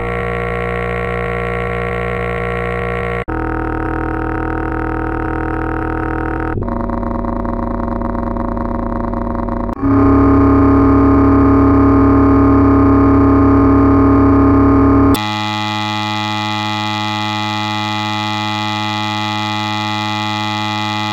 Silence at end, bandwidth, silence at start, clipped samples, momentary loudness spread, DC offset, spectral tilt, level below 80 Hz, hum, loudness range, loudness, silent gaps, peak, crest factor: 0 s; 16.5 kHz; 0 s; under 0.1%; 10 LU; under 0.1%; -7 dB/octave; -24 dBFS; none; 9 LU; -14 LUFS; none; -2 dBFS; 12 dB